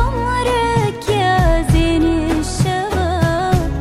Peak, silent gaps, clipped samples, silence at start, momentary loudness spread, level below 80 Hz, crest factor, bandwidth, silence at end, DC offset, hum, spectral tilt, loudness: -4 dBFS; none; under 0.1%; 0 s; 4 LU; -22 dBFS; 12 dB; 15.5 kHz; 0 s; under 0.1%; none; -6 dB/octave; -16 LUFS